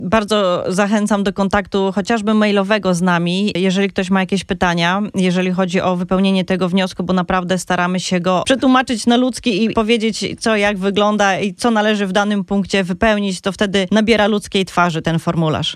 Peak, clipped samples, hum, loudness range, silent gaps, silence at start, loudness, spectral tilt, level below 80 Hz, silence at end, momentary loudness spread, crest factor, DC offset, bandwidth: -2 dBFS; under 0.1%; none; 1 LU; none; 0 s; -16 LUFS; -5 dB/octave; -44 dBFS; 0 s; 4 LU; 14 dB; under 0.1%; 12.5 kHz